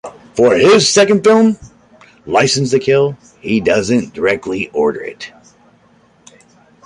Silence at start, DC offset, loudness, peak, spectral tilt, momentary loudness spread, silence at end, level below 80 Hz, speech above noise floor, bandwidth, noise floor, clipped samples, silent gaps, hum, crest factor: 0.05 s; under 0.1%; -13 LUFS; 0 dBFS; -4 dB/octave; 17 LU; 1.55 s; -50 dBFS; 38 dB; 11.5 kHz; -50 dBFS; under 0.1%; none; none; 14 dB